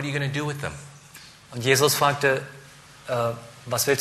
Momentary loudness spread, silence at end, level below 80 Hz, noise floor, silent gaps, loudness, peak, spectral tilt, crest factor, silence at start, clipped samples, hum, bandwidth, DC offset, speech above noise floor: 24 LU; 0 s; -58 dBFS; -47 dBFS; none; -24 LUFS; -4 dBFS; -3.5 dB/octave; 22 dB; 0 s; under 0.1%; none; 15 kHz; under 0.1%; 24 dB